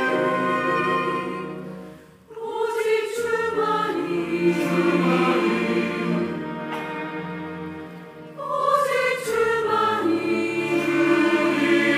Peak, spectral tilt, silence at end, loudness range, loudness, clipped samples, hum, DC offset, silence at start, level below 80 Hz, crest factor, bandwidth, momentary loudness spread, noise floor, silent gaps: -6 dBFS; -5.5 dB/octave; 0 s; 5 LU; -22 LUFS; under 0.1%; none; under 0.1%; 0 s; -64 dBFS; 16 dB; 15.5 kHz; 15 LU; -44 dBFS; none